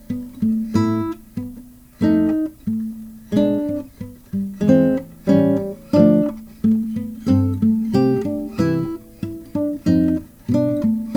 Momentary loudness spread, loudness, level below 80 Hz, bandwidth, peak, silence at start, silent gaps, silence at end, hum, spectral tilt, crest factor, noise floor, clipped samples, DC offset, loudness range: 14 LU; -19 LUFS; -48 dBFS; 18.5 kHz; 0 dBFS; 0.1 s; none; 0 s; none; -9 dB/octave; 18 dB; -41 dBFS; under 0.1%; under 0.1%; 4 LU